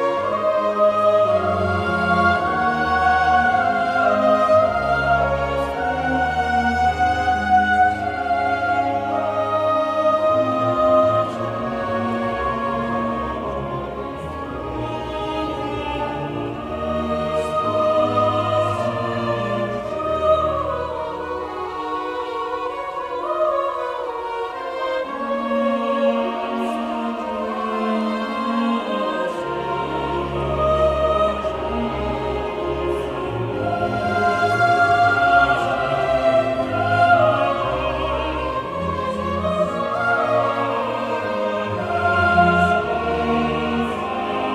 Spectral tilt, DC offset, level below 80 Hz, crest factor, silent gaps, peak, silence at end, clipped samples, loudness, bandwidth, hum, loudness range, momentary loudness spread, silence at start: -6.5 dB/octave; under 0.1%; -40 dBFS; 16 dB; none; -4 dBFS; 0 s; under 0.1%; -20 LUFS; 12 kHz; none; 7 LU; 10 LU; 0 s